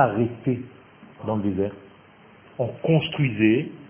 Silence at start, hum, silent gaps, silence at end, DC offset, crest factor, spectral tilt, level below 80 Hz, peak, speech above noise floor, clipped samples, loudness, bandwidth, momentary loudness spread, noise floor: 0 s; none; none; 0 s; under 0.1%; 20 dB; -11.5 dB/octave; -54 dBFS; -4 dBFS; 28 dB; under 0.1%; -24 LUFS; 3.6 kHz; 12 LU; -51 dBFS